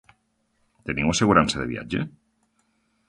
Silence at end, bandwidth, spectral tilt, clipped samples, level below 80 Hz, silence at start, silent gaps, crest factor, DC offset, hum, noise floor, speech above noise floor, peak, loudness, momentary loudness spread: 1 s; 11.5 kHz; -4.5 dB/octave; under 0.1%; -46 dBFS; 0.85 s; none; 24 dB; under 0.1%; none; -70 dBFS; 48 dB; -2 dBFS; -23 LUFS; 15 LU